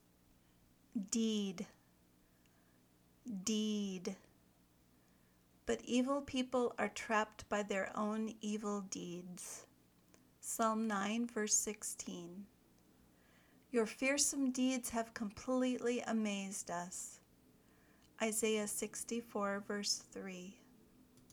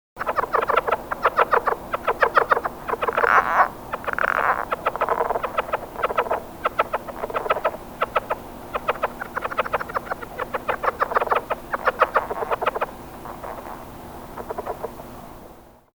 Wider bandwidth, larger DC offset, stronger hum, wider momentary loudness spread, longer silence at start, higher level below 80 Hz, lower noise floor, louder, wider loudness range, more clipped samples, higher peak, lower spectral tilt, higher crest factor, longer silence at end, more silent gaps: about the same, over 20 kHz vs over 20 kHz; neither; first, 60 Hz at -75 dBFS vs none; about the same, 14 LU vs 16 LU; first, 0.95 s vs 0.15 s; second, -74 dBFS vs -48 dBFS; first, -70 dBFS vs -46 dBFS; second, -39 LUFS vs -23 LUFS; about the same, 6 LU vs 6 LU; neither; second, -20 dBFS vs -2 dBFS; second, -3 dB/octave vs -4.5 dB/octave; about the same, 22 dB vs 24 dB; second, 0.1 s vs 0.25 s; neither